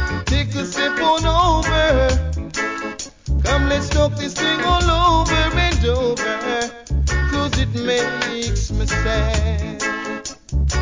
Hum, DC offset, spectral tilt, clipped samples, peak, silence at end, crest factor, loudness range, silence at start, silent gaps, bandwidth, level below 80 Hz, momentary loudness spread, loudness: none; 0.1%; -4.5 dB/octave; under 0.1%; -4 dBFS; 0 s; 14 dB; 3 LU; 0 s; none; 7.6 kHz; -24 dBFS; 8 LU; -19 LUFS